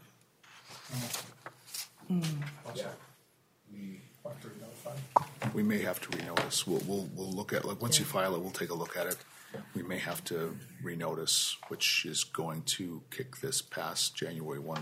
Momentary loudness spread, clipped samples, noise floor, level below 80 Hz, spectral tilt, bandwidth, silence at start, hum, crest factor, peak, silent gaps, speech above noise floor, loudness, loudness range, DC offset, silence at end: 19 LU; under 0.1%; -68 dBFS; -76 dBFS; -3 dB/octave; 16 kHz; 0 s; none; 28 dB; -8 dBFS; none; 33 dB; -34 LUFS; 8 LU; under 0.1%; 0 s